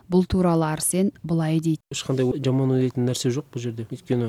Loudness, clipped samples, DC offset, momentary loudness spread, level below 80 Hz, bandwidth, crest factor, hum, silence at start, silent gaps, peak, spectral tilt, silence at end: -23 LUFS; under 0.1%; under 0.1%; 8 LU; -46 dBFS; 15.5 kHz; 14 dB; none; 0.1 s; none; -10 dBFS; -6 dB/octave; 0 s